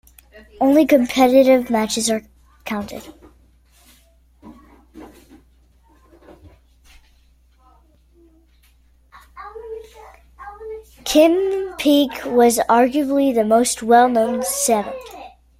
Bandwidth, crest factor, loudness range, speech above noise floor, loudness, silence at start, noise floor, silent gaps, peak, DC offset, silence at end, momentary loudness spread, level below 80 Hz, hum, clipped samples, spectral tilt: 16.5 kHz; 18 dB; 20 LU; 38 dB; -16 LUFS; 0.6 s; -54 dBFS; none; -2 dBFS; under 0.1%; 0.3 s; 23 LU; -52 dBFS; none; under 0.1%; -3.5 dB/octave